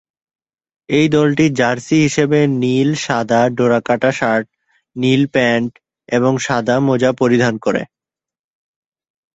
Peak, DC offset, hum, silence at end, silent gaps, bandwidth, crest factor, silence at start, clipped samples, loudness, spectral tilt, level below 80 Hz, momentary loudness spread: -2 dBFS; under 0.1%; none; 1.5 s; none; 8.2 kHz; 14 dB; 0.9 s; under 0.1%; -15 LUFS; -6 dB/octave; -54 dBFS; 6 LU